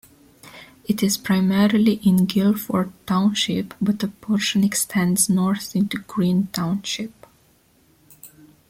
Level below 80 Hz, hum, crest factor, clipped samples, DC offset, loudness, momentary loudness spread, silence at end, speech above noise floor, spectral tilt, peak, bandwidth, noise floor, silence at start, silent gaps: -56 dBFS; none; 18 dB; under 0.1%; under 0.1%; -21 LUFS; 7 LU; 0.45 s; 38 dB; -4.5 dB/octave; -4 dBFS; 16.5 kHz; -58 dBFS; 0.45 s; none